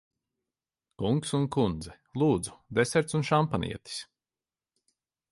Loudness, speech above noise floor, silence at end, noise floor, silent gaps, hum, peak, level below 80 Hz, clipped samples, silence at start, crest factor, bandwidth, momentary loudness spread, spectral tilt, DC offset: -28 LUFS; over 62 dB; 1.3 s; under -90 dBFS; none; none; -12 dBFS; -54 dBFS; under 0.1%; 1 s; 20 dB; 11.5 kHz; 13 LU; -5.5 dB/octave; under 0.1%